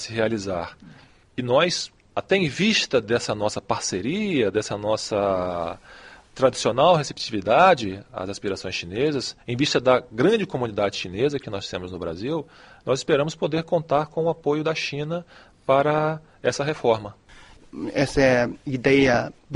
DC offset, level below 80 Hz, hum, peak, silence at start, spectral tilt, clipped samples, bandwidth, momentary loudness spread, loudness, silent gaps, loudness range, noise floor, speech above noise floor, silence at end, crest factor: under 0.1%; -52 dBFS; none; -2 dBFS; 0 s; -4.5 dB/octave; under 0.1%; 11.5 kHz; 13 LU; -23 LUFS; none; 4 LU; -48 dBFS; 25 dB; 0 s; 20 dB